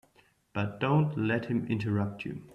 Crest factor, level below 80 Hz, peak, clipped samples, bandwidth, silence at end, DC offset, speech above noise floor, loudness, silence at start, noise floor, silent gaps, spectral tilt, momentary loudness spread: 16 dB; -64 dBFS; -14 dBFS; under 0.1%; 6 kHz; 0 s; under 0.1%; 36 dB; -31 LUFS; 0.55 s; -66 dBFS; none; -9 dB/octave; 9 LU